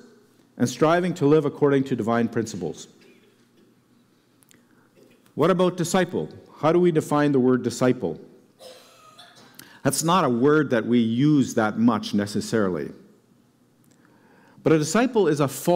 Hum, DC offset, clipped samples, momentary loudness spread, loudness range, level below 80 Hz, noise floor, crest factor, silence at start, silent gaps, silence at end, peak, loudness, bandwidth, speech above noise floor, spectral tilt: none; under 0.1%; under 0.1%; 10 LU; 6 LU; -64 dBFS; -60 dBFS; 14 dB; 0.55 s; none; 0 s; -8 dBFS; -22 LUFS; 16 kHz; 39 dB; -6 dB/octave